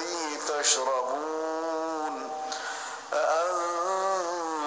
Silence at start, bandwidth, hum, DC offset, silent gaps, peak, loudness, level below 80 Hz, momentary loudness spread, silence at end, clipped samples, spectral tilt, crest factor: 0 s; 10 kHz; none; under 0.1%; none; -12 dBFS; -29 LUFS; -82 dBFS; 9 LU; 0 s; under 0.1%; 0 dB/octave; 18 dB